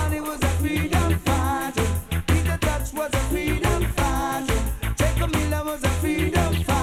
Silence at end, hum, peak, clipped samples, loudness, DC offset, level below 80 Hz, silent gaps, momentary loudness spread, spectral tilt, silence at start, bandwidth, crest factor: 0 s; none; -8 dBFS; under 0.1%; -24 LUFS; under 0.1%; -28 dBFS; none; 4 LU; -5 dB/octave; 0 s; 16.5 kHz; 16 dB